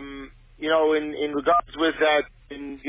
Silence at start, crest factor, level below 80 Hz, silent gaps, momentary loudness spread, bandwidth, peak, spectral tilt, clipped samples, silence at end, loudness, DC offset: 0 s; 14 dB; -52 dBFS; none; 17 LU; 3.9 kHz; -10 dBFS; -7.5 dB/octave; under 0.1%; 0 s; -23 LUFS; under 0.1%